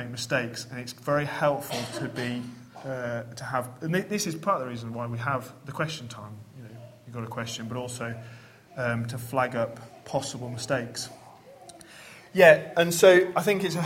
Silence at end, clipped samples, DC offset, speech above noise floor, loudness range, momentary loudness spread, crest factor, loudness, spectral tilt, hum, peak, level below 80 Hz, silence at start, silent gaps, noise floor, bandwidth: 0 s; under 0.1%; under 0.1%; 23 dB; 12 LU; 25 LU; 24 dB; -27 LUFS; -4.5 dB/octave; none; -4 dBFS; -66 dBFS; 0 s; none; -50 dBFS; 16.5 kHz